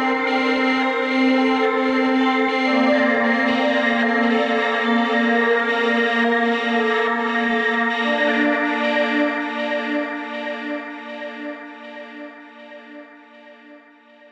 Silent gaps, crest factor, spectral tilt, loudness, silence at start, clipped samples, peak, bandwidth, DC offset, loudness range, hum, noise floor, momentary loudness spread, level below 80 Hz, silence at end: none; 14 dB; -4.5 dB/octave; -19 LUFS; 0 s; under 0.1%; -6 dBFS; 8.4 kHz; under 0.1%; 13 LU; none; -49 dBFS; 15 LU; -68 dBFS; 0.55 s